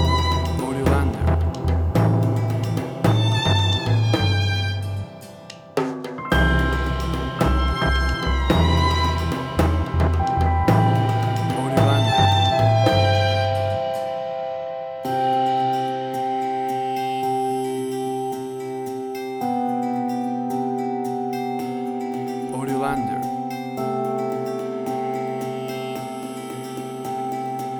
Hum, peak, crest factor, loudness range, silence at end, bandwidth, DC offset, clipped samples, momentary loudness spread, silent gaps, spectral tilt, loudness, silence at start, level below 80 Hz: none; -4 dBFS; 18 dB; 7 LU; 0 s; 19 kHz; under 0.1%; under 0.1%; 11 LU; none; -6.5 dB/octave; -22 LUFS; 0 s; -30 dBFS